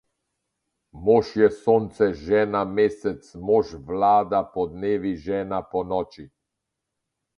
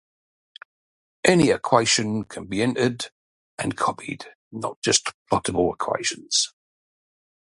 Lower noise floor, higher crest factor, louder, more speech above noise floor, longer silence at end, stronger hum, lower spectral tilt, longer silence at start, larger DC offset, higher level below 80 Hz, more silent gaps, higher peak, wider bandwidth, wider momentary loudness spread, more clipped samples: second, -82 dBFS vs under -90 dBFS; about the same, 20 dB vs 24 dB; about the same, -23 LUFS vs -22 LUFS; second, 60 dB vs over 67 dB; about the same, 1.1 s vs 1.05 s; neither; first, -7.5 dB/octave vs -3.5 dB/octave; second, 0.95 s vs 1.25 s; neither; about the same, -52 dBFS vs -54 dBFS; second, none vs 3.12-3.57 s, 4.35-4.51 s, 4.76-4.82 s, 5.14-5.26 s; second, -4 dBFS vs 0 dBFS; second, 7 kHz vs 11.5 kHz; second, 9 LU vs 15 LU; neither